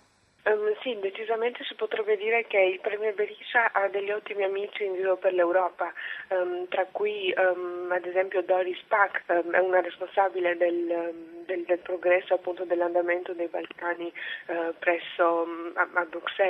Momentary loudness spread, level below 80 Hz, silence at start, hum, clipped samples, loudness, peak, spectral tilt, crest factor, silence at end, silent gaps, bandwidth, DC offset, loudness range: 8 LU; -80 dBFS; 0.45 s; none; under 0.1%; -27 LUFS; -6 dBFS; -5.5 dB/octave; 20 dB; 0 s; none; 4.2 kHz; under 0.1%; 3 LU